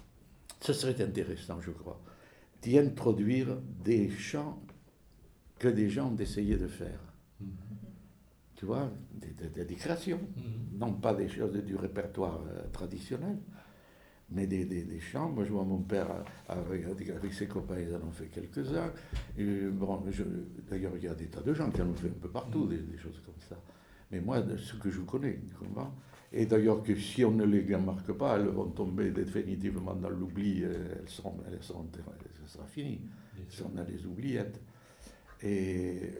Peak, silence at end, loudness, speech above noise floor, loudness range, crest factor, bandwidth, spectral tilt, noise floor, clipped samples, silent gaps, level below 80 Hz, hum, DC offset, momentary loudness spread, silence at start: -12 dBFS; 0 s; -35 LUFS; 26 dB; 9 LU; 24 dB; over 20 kHz; -7 dB/octave; -61 dBFS; under 0.1%; none; -52 dBFS; none; under 0.1%; 17 LU; 0 s